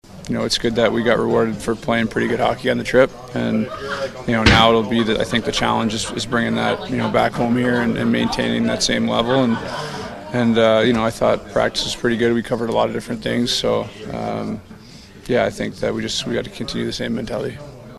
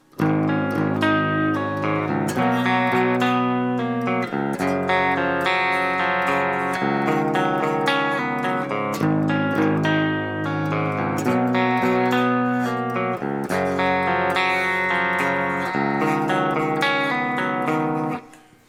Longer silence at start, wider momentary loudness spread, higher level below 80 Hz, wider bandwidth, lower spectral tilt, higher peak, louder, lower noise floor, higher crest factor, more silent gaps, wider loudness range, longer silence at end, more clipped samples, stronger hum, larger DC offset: about the same, 0.1 s vs 0.15 s; first, 10 LU vs 4 LU; first, -40 dBFS vs -62 dBFS; second, 13 kHz vs 16.5 kHz; second, -4.5 dB/octave vs -6 dB/octave; first, 0 dBFS vs -6 dBFS; about the same, -19 LUFS vs -21 LUFS; second, -41 dBFS vs -45 dBFS; first, 20 dB vs 14 dB; neither; first, 5 LU vs 1 LU; second, 0 s vs 0.35 s; neither; neither; neither